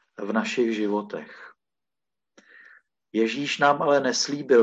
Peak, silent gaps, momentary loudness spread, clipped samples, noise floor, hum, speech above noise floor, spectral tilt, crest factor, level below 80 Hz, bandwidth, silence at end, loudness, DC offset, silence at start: -6 dBFS; none; 12 LU; under 0.1%; under -90 dBFS; none; over 67 dB; -3.5 dB/octave; 18 dB; -76 dBFS; 8.6 kHz; 0 s; -24 LUFS; under 0.1%; 0.2 s